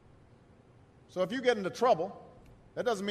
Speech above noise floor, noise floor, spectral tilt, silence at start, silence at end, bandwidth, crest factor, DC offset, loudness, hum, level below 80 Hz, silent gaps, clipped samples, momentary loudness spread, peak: 29 dB; -59 dBFS; -5 dB/octave; 1.15 s; 0 s; 14 kHz; 20 dB; under 0.1%; -31 LUFS; none; -68 dBFS; none; under 0.1%; 15 LU; -14 dBFS